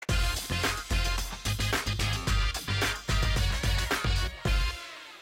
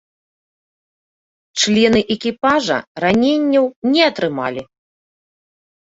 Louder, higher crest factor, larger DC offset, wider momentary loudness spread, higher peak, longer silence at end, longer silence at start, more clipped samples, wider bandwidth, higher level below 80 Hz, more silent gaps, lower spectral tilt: second, -29 LUFS vs -16 LUFS; second, 12 dB vs 18 dB; neither; second, 3 LU vs 9 LU; second, -18 dBFS vs -2 dBFS; second, 0 s vs 1.35 s; second, 0 s vs 1.55 s; neither; first, 16.5 kHz vs 8 kHz; first, -32 dBFS vs -52 dBFS; second, none vs 2.87-2.95 s, 3.76-3.82 s; about the same, -3.5 dB/octave vs -4 dB/octave